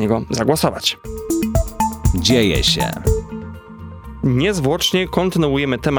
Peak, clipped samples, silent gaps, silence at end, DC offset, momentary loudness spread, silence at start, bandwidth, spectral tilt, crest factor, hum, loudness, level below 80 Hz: 0 dBFS; under 0.1%; none; 0 s; under 0.1%; 17 LU; 0 s; over 20 kHz; -5 dB/octave; 18 dB; none; -18 LUFS; -28 dBFS